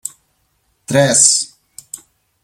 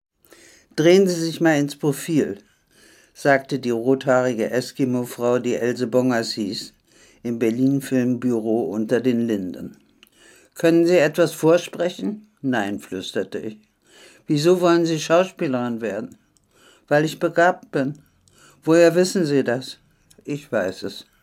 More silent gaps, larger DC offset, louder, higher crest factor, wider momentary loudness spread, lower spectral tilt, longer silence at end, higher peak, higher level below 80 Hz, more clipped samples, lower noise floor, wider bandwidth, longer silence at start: neither; neither; first, -11 LUFS vs -21 LUFS; about the same, 18 dB vs 18 dB; first, 24 LU vs 15 LU; second, -2.5 dB/octave vs -5.5 dB/octave; first, 0.45 s vs 0.2 s; about the same, 0 dBFS vs -2 dBFS; first, -60 dBFS vs -68 dBFS; neither; first, -63 dBFS vs -56 dBFS; about the same, 17 kHz vs 16 kHz; second, 0.05 s vs 0.75 s